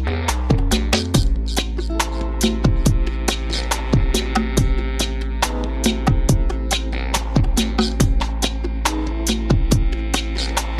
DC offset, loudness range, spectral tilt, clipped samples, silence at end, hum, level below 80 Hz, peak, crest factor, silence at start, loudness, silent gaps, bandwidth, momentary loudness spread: under 0.1%; 1 LU; -4.5 dB/octave; under 0.1%; 0 s; none; -20 dBFS; -4 dBFS; 14 dB; 0 s; -20 LUFS; none; 15 kHz; 4 LU